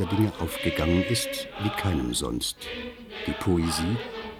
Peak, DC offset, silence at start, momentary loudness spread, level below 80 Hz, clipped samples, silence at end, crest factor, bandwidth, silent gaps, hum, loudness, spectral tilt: -10 dBFS; under 0.1%; 0 s; 11 LU; -42 dBFS; under 0.1%; 0 s; 18 dB; 18 kHz; none; none; -27 LUFS; -5 dB/octave